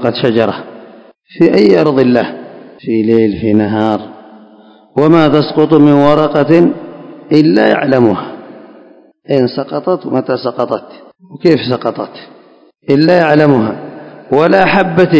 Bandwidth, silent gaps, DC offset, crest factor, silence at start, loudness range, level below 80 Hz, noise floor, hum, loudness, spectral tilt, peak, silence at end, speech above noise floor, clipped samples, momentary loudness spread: 8 kHz; none; under 0.1%; 12 dB; 0 s; 6 LU; -48 dBFS; -44 dBFS; none; -11 LUFS; -8.5 dB/octave; 0 dBFS; 0 s; 34 dB; 1%; 18 LU